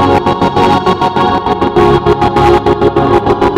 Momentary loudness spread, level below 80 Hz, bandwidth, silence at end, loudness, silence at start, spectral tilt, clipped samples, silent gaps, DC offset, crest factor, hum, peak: 3 LU; -26 dBFS; 11.5 kHz; 0 s; -10 LUFS; 0 s; -7 dB/octave; 0.5%; none; under 0.1%; 8 dB; none; 0 dBFS